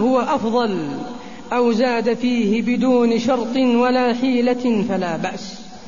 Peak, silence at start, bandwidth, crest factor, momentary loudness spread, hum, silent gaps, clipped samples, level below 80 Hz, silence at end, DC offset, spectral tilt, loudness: -6 dBFS; 0 s; 7.4 kHz; 14 dB; 11 LU; none; none; under 0.1%; -54 dBFS; 0 s; 1%; -6 dB/octave; -19 LUFS